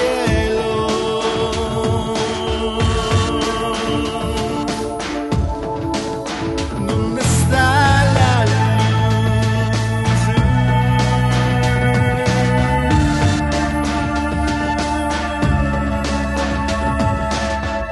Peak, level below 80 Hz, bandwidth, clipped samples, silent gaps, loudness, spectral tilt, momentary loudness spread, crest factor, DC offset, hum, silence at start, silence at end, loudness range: -2 dBFS; -26 dBFS; 12 kHz; under 0.1%; none; -17 LUFS; -5.5 dB/octave; 7 LU; 16 dB; under 0.1%; none; 0 s; 0 s; 5 LU